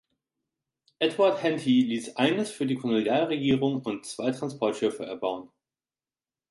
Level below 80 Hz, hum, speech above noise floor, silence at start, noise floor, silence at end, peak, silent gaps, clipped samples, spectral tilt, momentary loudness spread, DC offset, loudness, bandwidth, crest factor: -66 dBFS; none; over 64 dB; 1 s; under -90 dBFS; 1.05 s; -10 dBFS; none; under 0.1%; -5.5 dB/octave; 8 LU; under 0.1%; -27 LUFS; 11.5 kHz; 18 dB